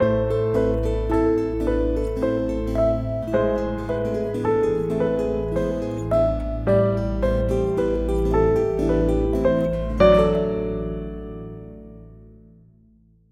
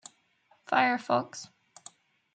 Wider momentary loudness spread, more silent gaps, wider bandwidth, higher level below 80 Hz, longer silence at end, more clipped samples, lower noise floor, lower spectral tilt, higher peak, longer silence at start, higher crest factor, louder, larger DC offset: second, 8 LU vs 25 LU; neither; first, 10.5 kHz vs 9.4 kHz; first, -30 dBFS vs -80 dBFS; about the same, 1 s vs 0.9 s; neither; second, -55 dBFS vs -68 dBFS; first, -8.5 dB/octave vs -3.5 dB/octave; first, -2 dBFS vs -10 dBFS; second, 0 s vs 0.7 s; about the same, 20 dB vs 22 dB; first, -22 LUFS vs -28 LUFS; neither